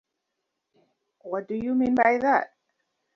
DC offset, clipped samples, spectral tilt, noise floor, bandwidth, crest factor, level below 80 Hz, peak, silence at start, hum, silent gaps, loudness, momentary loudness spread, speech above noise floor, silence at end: under 0.1%; under 0.1%; -7 dB/octave; -81 dBFS; 6.4 kHz; 20 dB; -64 dBFS; -6 dBFS; 1.25 s; none; none; -24 LUFS; 13 LU; 58 dB; 0.7 s